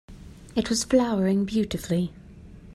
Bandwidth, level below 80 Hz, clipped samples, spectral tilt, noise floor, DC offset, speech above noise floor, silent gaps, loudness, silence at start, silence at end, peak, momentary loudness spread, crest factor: 14.5 kHz; -48 dBFS; under 0.1%; -5.5 dB/octave; -45 dBFS; under 0.1%; 22 dB; none; -25 LUFS; 0.1 s; 0 s; -8 dBFS; 8 LU; 18 dB